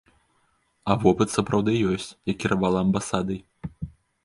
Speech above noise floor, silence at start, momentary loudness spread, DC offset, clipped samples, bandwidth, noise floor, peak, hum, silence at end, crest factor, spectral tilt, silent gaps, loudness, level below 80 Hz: 45 dB; 0.85 s; 16 LU; under 0.1%; under 0.1%; 11.5 kHz; -68 dBFS; -4 dBFS; none; 0.35 s; 22 dB; -6 dB/octave; none; -24 LUFS; -48 dBFS